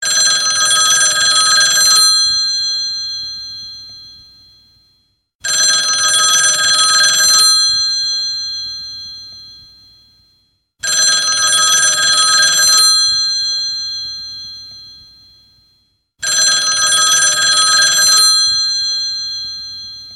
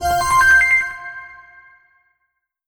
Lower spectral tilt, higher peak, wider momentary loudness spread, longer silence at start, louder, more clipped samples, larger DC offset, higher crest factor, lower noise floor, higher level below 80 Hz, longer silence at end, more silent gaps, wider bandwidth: second, 3 dB/octave vs -1.5 dB/octave; first, 0 dBFS vs -4 dBFS; second, 17 LU vs 22 LU; about the same, 0 s vs 0 s; first, -10 LUFS vs -13 LUFS; neither; neither; about the same, 14 dB vs 14 dB; second, -60 dBFS vs -73 dBFS; second, -54 dBFS vs -42 dBFS; second, 0 s vs 1.35 s; first, 5.35-5.39 s vs none; second, 16 kHz vs over 20 kHz